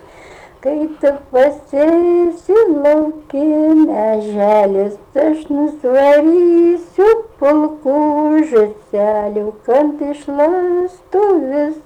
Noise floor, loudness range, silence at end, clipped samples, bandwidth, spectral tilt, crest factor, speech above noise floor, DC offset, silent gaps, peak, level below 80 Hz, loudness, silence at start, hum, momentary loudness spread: -39 dBFS; 3 LU; 0.05 s; under 0.1%; 9.2 kHz; -7 dB/octave; 10 dB; 26 dB; under 0.1%; none; -4 dBFS; -50 dBFS; -14 LUFS; 0.3 s; none; 8 LU